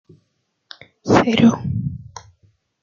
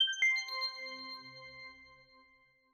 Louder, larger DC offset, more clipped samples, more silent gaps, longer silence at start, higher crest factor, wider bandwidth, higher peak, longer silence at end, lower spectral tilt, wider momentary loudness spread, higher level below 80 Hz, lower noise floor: first, -17 LUFS vs -34 LUFS; neither; neither; neither; first, 1.05 s vs 0 s; about the same, 18 dB vs 18 dB; second, 7.4 kHz vs 15.5 kHz; first, -2 dBFS vs -20 dBFS; about the same, 0.65 s vs 0.7 s; first, -6.5 dB/octave vs 1 dB/octave; about the same, 21 LU vs 21 LU; first, -50 dBFS vs -80 dBFS; about the same, -70 dBFS vs -68 dBFS